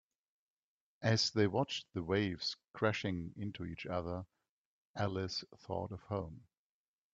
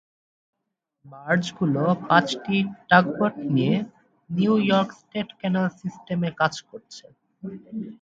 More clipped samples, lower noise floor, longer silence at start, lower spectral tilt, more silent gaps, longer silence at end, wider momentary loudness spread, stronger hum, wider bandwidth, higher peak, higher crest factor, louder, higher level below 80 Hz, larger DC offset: neither; first, under -90 dBFS vs -80 dBFS; about the same, 1 s vs 1.05 s; second, -5 dB/octave vs -6.5 dB/octave; first, 2.68-2.72 s, 4.49-4.94 s vs none; first, 0.7 s vs 0.1 s; second, 12 LU vs 20 LU; neither; about the same, 7.8 kHz vs 7.8 kHz; second, -16 dBFS vs -2 dBFS; about the same, 22 dB vs 22 dB; second, -38 LUFS vs -23 LUFS; about the same, -68 dBFS vs -66 dBFS; neither